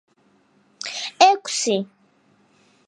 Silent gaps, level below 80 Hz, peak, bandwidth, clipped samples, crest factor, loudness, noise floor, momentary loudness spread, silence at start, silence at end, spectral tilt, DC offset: none; -78 dBFS; 0 dBFS; 11.5 kHz; under 0.1%; 24 dB; -20 LUFS; -60 dBFS; 17 LU; 0.85 s; 1.05 s; -2 dB/octave; under 0.1%